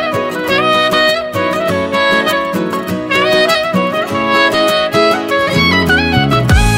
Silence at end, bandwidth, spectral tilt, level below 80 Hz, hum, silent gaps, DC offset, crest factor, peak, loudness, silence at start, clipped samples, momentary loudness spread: 0 s; 16.5 kHz; -5 dB/octave; -26 dBFS; none; none; under 0.1%; 12 dB; 0 dBFS; -12 LUFS; 0 s; under 0.1%; 5 LU